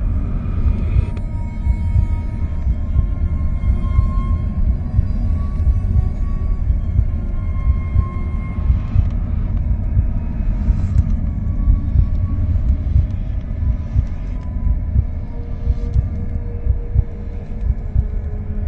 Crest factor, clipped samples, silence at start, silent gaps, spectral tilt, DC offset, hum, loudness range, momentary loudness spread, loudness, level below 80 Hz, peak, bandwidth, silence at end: 16 dB; under 0.1%; 0 s; none; -10.5 dB/octave; under 0.1%; none; 3 LU; 7 LU; -21 LUFS; -18 dBFS; -2 dBFS; 3.4 kHz; 0 s